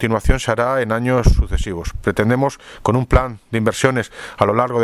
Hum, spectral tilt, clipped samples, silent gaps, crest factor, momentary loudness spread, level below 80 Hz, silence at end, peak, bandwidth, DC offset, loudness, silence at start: none; -6 dB/octave; under 0.1%; none; 16 dB; 7 LU; -24 dBFS; 0 s; 0 dBFS; 13.5 kHz; under 0.1%; -18 LUFS; 0 s